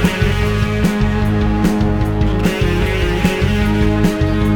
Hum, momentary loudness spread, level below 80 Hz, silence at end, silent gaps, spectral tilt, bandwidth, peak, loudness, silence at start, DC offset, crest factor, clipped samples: none; 2 LU; -22 dBFS; 0 s; none; -6.5 dB/octave; 18.5 kHz; -2 dBFS; -16 LUFS; 0 s; under 0.1%; 14 dB; under 0.1%